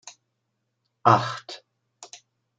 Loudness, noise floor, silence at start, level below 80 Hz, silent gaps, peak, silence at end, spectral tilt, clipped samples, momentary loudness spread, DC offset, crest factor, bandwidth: -22 LUFS; -78 dBFS; 0.05 s; -70 dBFS; none; -2 dBFS; 0.55 s; -5.5 dB/octave; under 0.1%; 25 LU; under 0.1%; 26 dB; 9.2 kHz